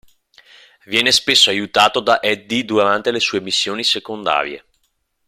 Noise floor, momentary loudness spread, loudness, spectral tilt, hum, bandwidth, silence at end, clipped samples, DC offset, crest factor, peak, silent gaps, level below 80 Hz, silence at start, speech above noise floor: -67 dBFS; 8 LU; -15 LUFS; -2 dB/octave; none; 16 kHz; 0.7 s; under 0.1%; under 0.1%; 18 dB; 0 dBFS; none; -58 dBFS; 0.9 s; 50 dB